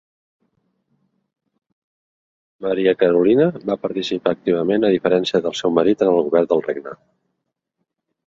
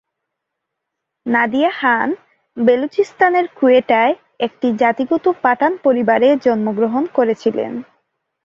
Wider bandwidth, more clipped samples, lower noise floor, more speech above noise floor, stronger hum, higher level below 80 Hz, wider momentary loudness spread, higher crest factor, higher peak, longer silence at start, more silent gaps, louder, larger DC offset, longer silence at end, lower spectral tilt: about the same, 7.8 kHz vs 7.4 kHz; neither; about the same, -77 dBFS vs -78 dBFS; second, 59 dB vs 63 dB; neither; about the same, -60 dBFS vs -62 dBFS; about the same, 8 LU vs 9 LU; about the same, 18 dB vs 16 dB; about the same, -2 dBFS vs -2 dBFS; first, 2.6 s vs 1.25 s; neither; about the same, -18 LUFS vs -16 LUFS; neither; first, 1.35 s vs 0.6 s; about the same, -6.5 dB/octave vs -6.5 dB/octave